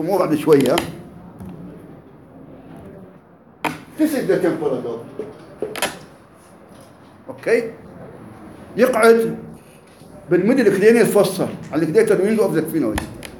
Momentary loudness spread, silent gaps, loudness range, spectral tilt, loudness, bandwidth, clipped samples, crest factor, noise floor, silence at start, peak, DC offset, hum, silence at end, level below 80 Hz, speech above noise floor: 25 LU; none; 10 LU; -5.5 dB/octave; -18 LUFS; 17 kHz; under 0.1%; 18 dB; -47 dBFS; 0 s; -2 dBFS; under 0.1%; none; 0 s; -50 dBFS; 30 dB